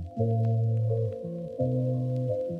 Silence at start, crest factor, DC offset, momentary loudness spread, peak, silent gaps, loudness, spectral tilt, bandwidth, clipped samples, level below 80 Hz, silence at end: 0 s; 14 dB; under 0.1%; 6 LU; -14 dBFS; none; -29 LUFS; -12 dB/octave; 1.2 kHz; under 0.1%; -58 dBFS; 0 s